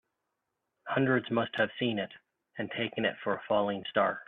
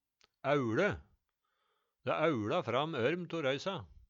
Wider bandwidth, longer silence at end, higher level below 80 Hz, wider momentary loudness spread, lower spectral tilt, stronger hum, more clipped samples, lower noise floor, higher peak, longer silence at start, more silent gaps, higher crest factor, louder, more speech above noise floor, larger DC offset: second, 4.6 kHz vs 7.6 kHz; about the same, 0.05 s vs 0.15 s; second, -72 dBFS vs -66 dBFS; first, 12 LU vs 9 LU; first, -8.5 dB/octave vs -6 dB/octave; neither; neither; about the same, -84 dBFS vs -83 dBFS; about the same, -14 dBFS vs -16 dBFS; first, 0.85 s vs 0.45 s; neither; about the same, 18 dB vs 20 dB; first, -31 LUFS vs -34 LUFS; first, 53 dB vs 49 dB; neither